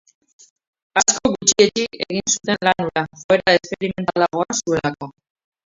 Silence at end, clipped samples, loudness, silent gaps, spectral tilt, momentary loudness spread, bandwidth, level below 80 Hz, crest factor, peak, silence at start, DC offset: 0.55 s; under 0.1%; -18 LUFS; 3.24-3.29 s; -2.5 dB/octave; 9 LU; 8 kHz; -52 dBFS; 20 dB; 0 dBFS; 0.95 s; under 0.1%